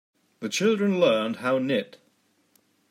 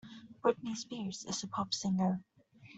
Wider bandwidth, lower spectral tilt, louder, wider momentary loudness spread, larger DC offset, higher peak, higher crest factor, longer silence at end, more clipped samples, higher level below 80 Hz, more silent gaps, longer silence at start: first, 16 kHz vs 8.2 kHz; about the same, -5 dB/octave vs -5 dB/octave; first, -24 LUFS vs -36 LUFS; first, 11 LU vs 8 LU; neither; first, -10 dBFS vs -18 dBFS; about the same, 18 dB vs 20 dB; first, 1.05 s vs 0 s; neither; about the same, -78 dBFS vs -74 dBFS; neither; first, 0.4 s vs 0.05 s